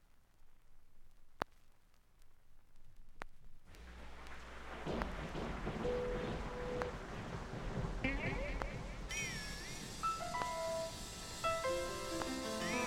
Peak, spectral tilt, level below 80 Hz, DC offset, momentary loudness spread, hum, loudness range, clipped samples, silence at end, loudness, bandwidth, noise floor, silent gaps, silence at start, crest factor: -18 dBFS; -4 dB/octave; -52 dBFS; under 0.1%; 14 LU; none; 14 LU; under 0.1%; 0 s; -42 LUFS; 17 kHz; -65 dBFS; none; 0 s; 26 dB